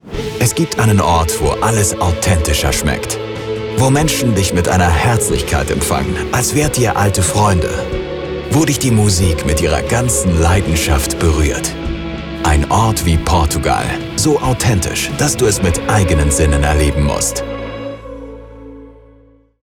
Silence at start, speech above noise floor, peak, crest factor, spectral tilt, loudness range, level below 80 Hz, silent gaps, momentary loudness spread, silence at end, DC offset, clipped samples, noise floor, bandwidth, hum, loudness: 0.05 s; 33 dB; -2 dBFS; 12 dB; -4.5 dB/octave; 1 LU; -24 dBFS; none; 9 LU; 0.7 s; under 0.1%; under 0.1%; -47 dBFS; 18 kHz; none; -14 LUFS